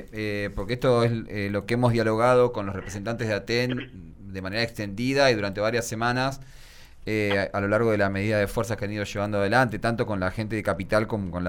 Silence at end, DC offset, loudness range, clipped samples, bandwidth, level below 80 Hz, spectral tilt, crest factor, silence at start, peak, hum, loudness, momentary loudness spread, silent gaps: 0 s; under 0.1%; 2 LU; under 0.1%; 17.5 kHz; -46 dBFS; -6 dB/octave; 18 dB; 0 s; -8 dBFS; none; -25 LUFS; 10 LU; none